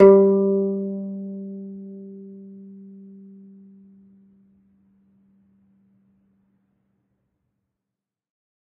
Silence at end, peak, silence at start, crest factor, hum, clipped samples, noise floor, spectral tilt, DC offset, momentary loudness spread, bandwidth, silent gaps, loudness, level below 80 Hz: 6.2 s; 0 dBFS; 0 s; 24 dB; none; under 0.1%; -87 dBFS; -10 dB/octave; under 0.1%; 28 LU; 2.9 kHz; none; -21 LUFS; -66 dBFS